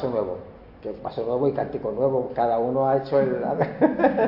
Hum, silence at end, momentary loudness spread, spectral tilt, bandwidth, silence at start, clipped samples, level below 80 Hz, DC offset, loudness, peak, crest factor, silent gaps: none; 0 s; 11 LU; -10.5 dB/octave; 5.8 kHz; 0 s; under 0.1%; -54 dBFS; under 0.1%; -24 LUFS; -4 dBFS; 18 dB; none